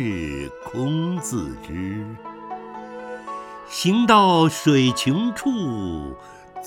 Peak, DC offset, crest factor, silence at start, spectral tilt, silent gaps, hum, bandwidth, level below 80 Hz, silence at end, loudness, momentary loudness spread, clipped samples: -2 dBFS; under 0.1%; 20 dB; 0 s; -5 dB/octave; none; none; 17.5 kHz; -48 dBFS; 0 s; -21 LUFS; 20 LU; under 0.1%